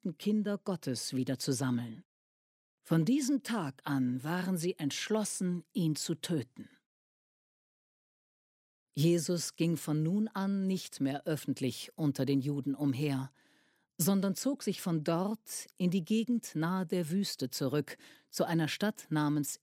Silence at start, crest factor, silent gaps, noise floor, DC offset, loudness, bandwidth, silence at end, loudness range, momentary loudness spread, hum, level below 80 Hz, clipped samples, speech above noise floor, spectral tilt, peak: 0.05 s; 18 dB; 2.05-2.78 s, 6.86-8.87 s; -71 dBFS; under 0.1%; -33 LUFS; 16 kHz; 0.05 s; 4 LU; 6 LU; none; -80 dBFS; under 0.1%; 38 dB; -5.5 dB/octave; -16 dBFS